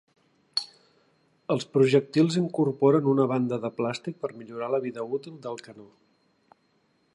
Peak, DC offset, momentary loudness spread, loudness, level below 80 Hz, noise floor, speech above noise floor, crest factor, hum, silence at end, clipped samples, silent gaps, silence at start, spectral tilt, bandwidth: -8 dBFS; under 0.1%; 16 LU; -26 LUFS; -76 dBFS; -68 dBFS; 43 dB; 18 dB; none; 1.3 s; under 0.1%; none; 0.55 s; -6.5 dB/octave; 11 kHz